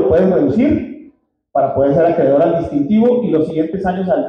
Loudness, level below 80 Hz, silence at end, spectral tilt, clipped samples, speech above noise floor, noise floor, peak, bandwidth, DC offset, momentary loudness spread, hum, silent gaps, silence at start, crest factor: -14 LUFS; -42 dBFS; 0 s; -10 dB/octave; under 0.1%; 34 dB; -47 dBFS; -4 dBFS; 6.4 kHz; under 0.1%; 6 LU; none; none; 0 s; 10 dB